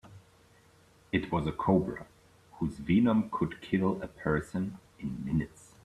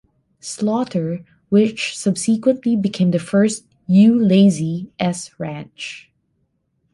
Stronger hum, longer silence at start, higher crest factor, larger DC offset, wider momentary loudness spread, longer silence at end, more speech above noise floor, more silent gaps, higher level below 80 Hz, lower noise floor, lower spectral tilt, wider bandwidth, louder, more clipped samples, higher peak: neither; second, 0.05 s vs 0.45 s; about the same, 20 dB vs 16 dB; neither; second, 12 LU vs 18 LU; second, 0.35 s vs 0.95 s; second, 31 dB vs 50 dB; neither; first, -54 dBFS vs -60 dBFS; second, -61 dBFS vs -68 dBFS; first, -8 dB/octave vs -6 dB/octave; about the same, 12 kHz vs 11.5 kHz; second, -31 LUFS vs -18 LUFS; neither; second, -12 dBFS vs -2 dBFS